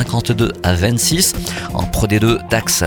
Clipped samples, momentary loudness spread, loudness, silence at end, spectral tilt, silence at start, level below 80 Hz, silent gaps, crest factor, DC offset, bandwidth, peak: under 0.1%; 8 LU; -16 LUFS; 0 s; -4 dB/octave; 0 s; -30 dBFS; none; 16 dB; under 0.1%; 19.5 kHz; 0 dBFS